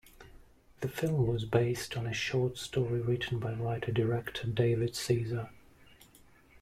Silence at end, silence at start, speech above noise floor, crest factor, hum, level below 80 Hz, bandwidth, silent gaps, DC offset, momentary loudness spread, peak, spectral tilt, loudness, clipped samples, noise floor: 0.05 s; 0.2 s; 28 dB; 18 dB; none; -56 dBFS; 15.5 kHz; none; under 0.1%; 6 LU; -14 dBFS; -6 dB/octave; -33 LUFS; under 0.1%; -60 dBFS